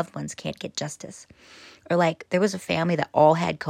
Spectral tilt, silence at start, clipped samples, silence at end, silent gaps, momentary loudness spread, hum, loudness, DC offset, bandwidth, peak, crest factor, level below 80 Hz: -5.5 dB/octave; 0 s; under 0.1%; 0 s; none; 14 LU; none; -24 LUFS; under 0.1%; 15.5 kHz; -4 dBFS; 20 dB; -64 dBFS